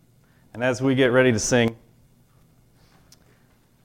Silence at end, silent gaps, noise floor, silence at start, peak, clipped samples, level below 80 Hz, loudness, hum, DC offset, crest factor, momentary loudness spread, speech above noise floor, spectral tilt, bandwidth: 2.1 s; none; -59 dBFS; 0.55 s; -6 dBFS; under 0.1%; -52 dBFS; -21 LUFS; none; under 0.1%; 20 dB; 9 LU; 39 dB; -4.5 dB/octave; 15.5 kHz